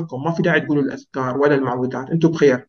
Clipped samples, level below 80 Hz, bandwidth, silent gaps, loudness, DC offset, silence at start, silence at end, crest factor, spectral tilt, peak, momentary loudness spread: under 0.1%; -60 dBFS; 6.8 kHz; none; -19 LUFS; under 0.1%; 0 s; 0.05 s; 16 dB; -7.5 dB/octave; -4 dBFS; 8 LU